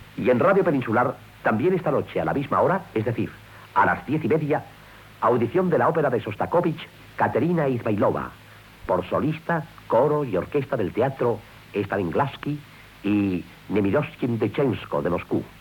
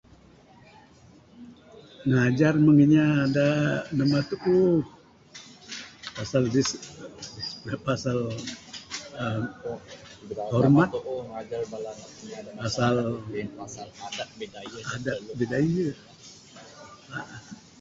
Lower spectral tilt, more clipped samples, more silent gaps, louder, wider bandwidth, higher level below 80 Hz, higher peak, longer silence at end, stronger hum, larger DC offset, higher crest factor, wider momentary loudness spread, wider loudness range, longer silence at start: first, -8.5 dB/octave vs -6.5 dB/octave; neither; neither; about the same, -24 LUFS vs -26 LUFS; first, 19 kHz vs 7.8 kHz; about the same, -54 dBFS vs -58 dBFS; about the same, -8 dBFS vs -8 dBFS; about the same, 0.1 s vs 0.2 s; neither; neither; about the same, 16 dB vs 20 dB; second, 9 LU vs 24 LU; second, 3 LU vs 9 LU; second, 0 s vs 1.4 s